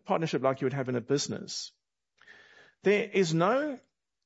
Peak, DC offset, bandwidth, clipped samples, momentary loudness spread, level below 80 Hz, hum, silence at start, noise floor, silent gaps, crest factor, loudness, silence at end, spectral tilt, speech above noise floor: -12 dBFS; under 0.1%; 8 kHz; under 0.1%; 11 LU; -78 dBFS; none; 0.05 s; -68 dBFS; none; 18 dB; -29 LUFS; 0.45 s; -5 dB/octave; 39 dB